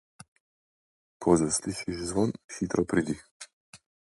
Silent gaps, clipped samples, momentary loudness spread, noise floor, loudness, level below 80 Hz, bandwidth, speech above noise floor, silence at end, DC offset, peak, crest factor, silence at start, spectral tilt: 2.44-2.49 s, 3.31-3.40 s, 3.53-3.73 s; under 0.1%; 18 LU; under -90 dBFS; -28 LUFS; -54 dBFS; 11.5 kHz; over 62 dB; 0.4 s; under 0.1%; -8 dBFS; 22 dB; 1.2 s; -5 dB/octave